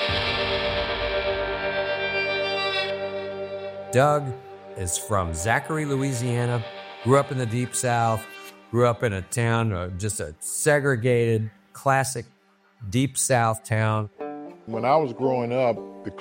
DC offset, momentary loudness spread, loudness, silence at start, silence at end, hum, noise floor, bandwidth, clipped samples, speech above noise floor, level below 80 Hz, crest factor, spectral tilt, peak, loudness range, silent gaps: under 0.1%; 12 LU; -24 LUFS; 0 s; 0 s; none; -57 dBFS; 16.5 kHz; under 0.1%; 34 dB; -48 dBFS; 18 dB; -4.5 dB/octave; -6 dBFS; 2 LU; none